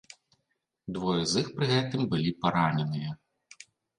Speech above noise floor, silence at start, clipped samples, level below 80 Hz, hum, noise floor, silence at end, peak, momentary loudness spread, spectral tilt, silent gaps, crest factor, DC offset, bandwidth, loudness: 51 dB; 0.85 s; under 0.1%; -60 dBFS; none; -80 dBFS; 0.85 s; -10 dBFS; 13 LU; -5.5 dB/octave; none; 20 dB; under 0.1%; 11 kHz; -29 LUFS